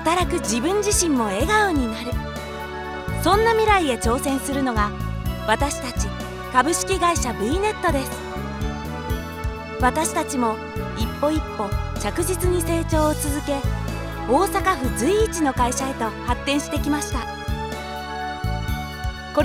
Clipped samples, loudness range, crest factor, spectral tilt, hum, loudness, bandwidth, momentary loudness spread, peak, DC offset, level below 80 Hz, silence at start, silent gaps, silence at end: under 0.1%; 4 LU; 20 dB; -4.5 dB/octave; none; -23 LUFS; 17 kHz; 10 LU; -2 dBFS; under 0.1%; -32 dBFS; 0 s; none; 0 s